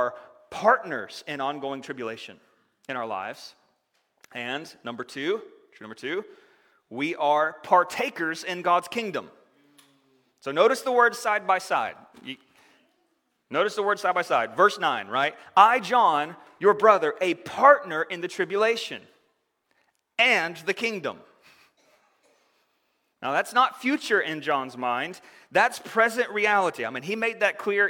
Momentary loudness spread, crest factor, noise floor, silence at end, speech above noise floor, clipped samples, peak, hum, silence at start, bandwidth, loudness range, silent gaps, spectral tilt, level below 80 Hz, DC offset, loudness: 16 LU; 24 dB; -73 dBFS; 0 s; 48 dB; under 0.1%; -2 dBFS; none; 0 s; 18 kHz; 13 LU; none; -3.5 dB/octave; -76 dBFS; under 0.1%; -24 LUFS